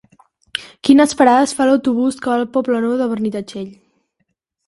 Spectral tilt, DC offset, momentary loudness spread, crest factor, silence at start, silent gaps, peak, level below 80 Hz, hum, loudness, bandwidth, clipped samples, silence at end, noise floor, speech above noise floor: -4.5 dB/octave; under 0.1%; 16 LU; 16 dB; 0.55 s; none; 0 dBFS; -58 dBFS; none; -15 LUFS; 11.5 kHz; under 0.1%; 0.95 s; -70 dBFS; 55 dB